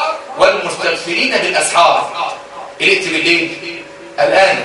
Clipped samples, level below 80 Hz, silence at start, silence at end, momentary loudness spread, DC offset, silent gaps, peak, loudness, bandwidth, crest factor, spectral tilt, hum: under 0.1%; -54 dBFS; 0 s; 0 s; 16 LU; under 0.1%; none; 0 dBFS; -13 LUFS; 11.5 kHz; 14 dB; -2 dB/octave; none